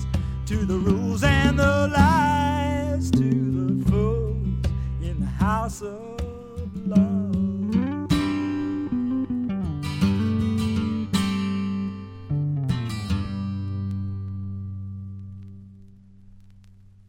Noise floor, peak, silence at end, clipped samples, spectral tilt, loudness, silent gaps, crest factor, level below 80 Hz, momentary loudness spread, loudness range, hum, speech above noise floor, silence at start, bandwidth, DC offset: -49 dBFS; -4 dBFS; 0.4 s; under 0.1%; -7 dB/octave; -24 LUFS; none; 20 dB; -34 dBFS; 14 LU; 9 LU; none; 29 dB; 0 s; 16 kHz; under 0.1%